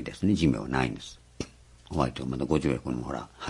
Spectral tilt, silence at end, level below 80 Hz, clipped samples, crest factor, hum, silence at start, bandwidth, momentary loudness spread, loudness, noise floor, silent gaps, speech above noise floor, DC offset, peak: -6.5 dB/octave; 0 s; -46 dBFS; under 0.1%; 20 dB; none; 0 s; 11.5 kHz; 16 LU; -29 LUFS; -49 dBFS; none; 21 dB; under 0.1%; -8 dBFS